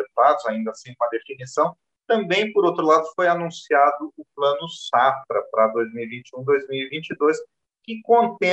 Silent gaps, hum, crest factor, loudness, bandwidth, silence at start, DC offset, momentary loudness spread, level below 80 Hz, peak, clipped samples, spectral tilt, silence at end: none; none; 18 dB; -21 LUFS; 8.4 kHz; 0 s; under 0.1%; 12 LU; -76 dBFS; -4 dBFS; under 0.1%; -5 dB/octave; 0 s